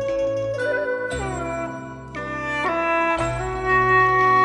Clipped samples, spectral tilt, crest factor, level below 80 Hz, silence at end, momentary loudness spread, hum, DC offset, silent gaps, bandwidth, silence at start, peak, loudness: under 0.1%; -5.5 dB/octave; 14 dB; -40 dBFS; 0 s; 14 LU; none; under 0.1%; none; 11.5 kHz; 0 s; -8 dBFS; -21 LUFS